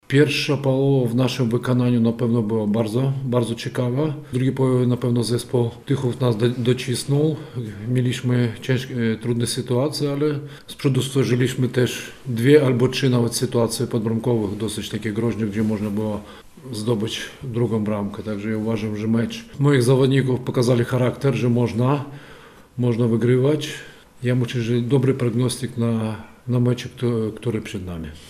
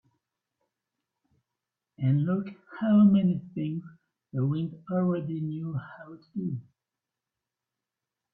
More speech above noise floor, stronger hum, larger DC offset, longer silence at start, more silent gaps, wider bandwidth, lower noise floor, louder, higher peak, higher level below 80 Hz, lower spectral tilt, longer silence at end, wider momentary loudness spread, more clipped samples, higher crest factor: second, 24 dB vs 62 dB; neither; neither; second, 0.1 s vs 2 s; neither; first, 15 kHz vs 3.8 kHz; second, -44 dBFS vs -89 dBFS; first, -21 LUFS vs -28 LUFS; first, -2 dBFS vs -12 dBFS; first, -52 dBFS vs -70 dBFS; second, -6.5 dB/octave vs -12 dB/octave; second, 0 s vs 1.7 s; second, 10 LU vs 18 LU; neither; about the same, 18 dB vs 18 dB